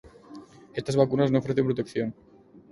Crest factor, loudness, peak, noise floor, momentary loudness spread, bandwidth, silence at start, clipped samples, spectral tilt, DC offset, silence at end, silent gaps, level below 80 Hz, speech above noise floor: 22 dB; -26 LUFS; -6 dBFS; -47 dBFS; 24 LU; 11.5 kHz; 0.05 s; under 0.1%; -7.5 dB/octave; under 0.1%; 0.6 s; none; -60 dBFS; 22 dB